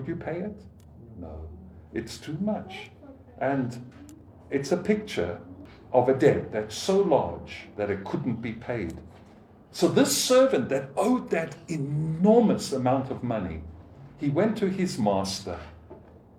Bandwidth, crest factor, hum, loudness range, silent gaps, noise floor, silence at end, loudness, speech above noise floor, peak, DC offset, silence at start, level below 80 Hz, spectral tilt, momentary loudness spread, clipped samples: 17.5 kHz; 20 dB; none; 10 LU; none; -52 dBFS; 0.3 s; -26 LUFS; 26 dB; -6 dBFS; under 0.1%; 0 s; -54 dBFS; -5.5 dB/octave; 21 LU; under 0.1%